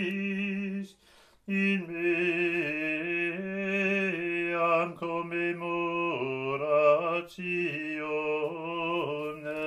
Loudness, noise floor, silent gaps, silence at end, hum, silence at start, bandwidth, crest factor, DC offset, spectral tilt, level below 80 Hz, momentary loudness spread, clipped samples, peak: -29 LUFS; -60 dBFS; none; 0 s; none; 0 s; 12 kHz; 20 dB; under 0.1%; -7 dB/octave; -72 dBFS; 7 LU; under 0.1%; -10 dBFS